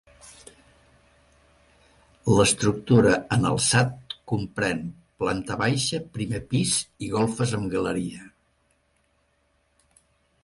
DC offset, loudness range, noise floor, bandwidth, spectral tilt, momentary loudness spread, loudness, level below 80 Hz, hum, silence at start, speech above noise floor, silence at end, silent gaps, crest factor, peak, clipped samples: under 0.1%; 6 LU; -68 dBFS; 11.5 kHz; -4.5 dB/octave; 13 LU; -24 LUFS; -50 dBFS; none; 0.25 s; 45 dB; 2.15 s; none; 20 dB; -6 dBFS; under 0.1%